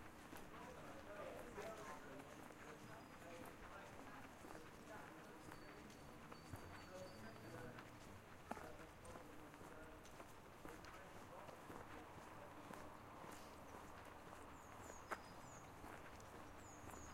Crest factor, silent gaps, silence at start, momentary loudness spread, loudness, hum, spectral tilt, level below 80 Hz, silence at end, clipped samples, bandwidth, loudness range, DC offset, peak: 28 dB; none; 0 s; 5 LU; -58 LUFS; none; -4.5 dB/octave; -70 dBFS; 0 s; under 0.1%; 16 kHz; 2 LU; under 0.1%; -30 dBFS